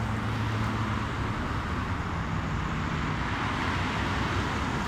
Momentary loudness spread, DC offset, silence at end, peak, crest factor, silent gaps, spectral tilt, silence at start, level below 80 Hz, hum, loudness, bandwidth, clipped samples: 3 LU; under 0.1%; 0 s; -16 dBFS; 12 dB; none; -6 dB/octave; 0 s; -38 dBFS; none; -30 LUFS; 13.5 kHz; under 0.1%